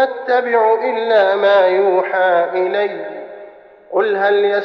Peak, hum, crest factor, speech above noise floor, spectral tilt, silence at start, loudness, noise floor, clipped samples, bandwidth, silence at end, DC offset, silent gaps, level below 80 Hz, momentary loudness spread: -4 dBFS; none; 12 dB; 25 dB; -6 dB/octave; 0 s; -15 LUFS; -39 dBFS; under 0.1%; 6 kHz; 0 s; under 0.1%; none; -70 dBFS; 11 LU